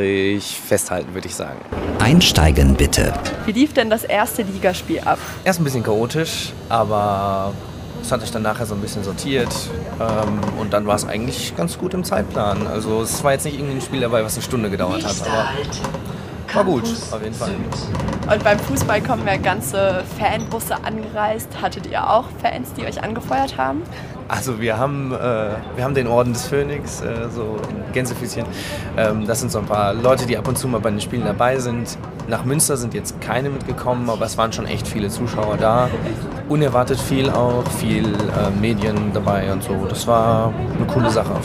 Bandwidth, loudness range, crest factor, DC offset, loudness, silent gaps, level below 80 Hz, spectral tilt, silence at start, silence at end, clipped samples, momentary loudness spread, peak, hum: 16 kHz; 5 LU; 18 dB; under 0.1%; -20 LUFS; none; -34 dBFS; -5 dB/octave; 0 s; 0 s; under 0.1%; 9 LU; -2 dBFS; none